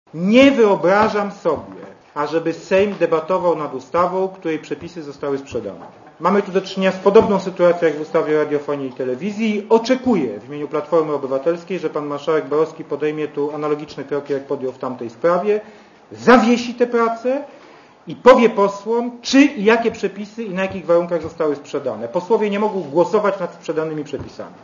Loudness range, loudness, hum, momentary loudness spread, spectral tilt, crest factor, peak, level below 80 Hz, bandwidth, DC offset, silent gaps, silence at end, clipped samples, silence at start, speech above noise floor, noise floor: 6 LU; -18 LUFS; none; 13 LU; -6 dB/octave; 18 dB; 0 dBFS; -56 dBFS; 7.4 kHz; under 0.1%; none; 0.1 s; under 0.1%; 0.15 s; 27 dB; -45 dBFS